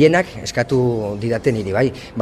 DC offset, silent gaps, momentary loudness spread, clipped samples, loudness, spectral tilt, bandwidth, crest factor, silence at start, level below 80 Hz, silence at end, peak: under 0.1%; none; 5 LU; under 0.1%; -19 LUFS; -6 dB/octave; 13 kHz; 16 dB; 0 s; -44 dBFS; 0 s; -2 dBFS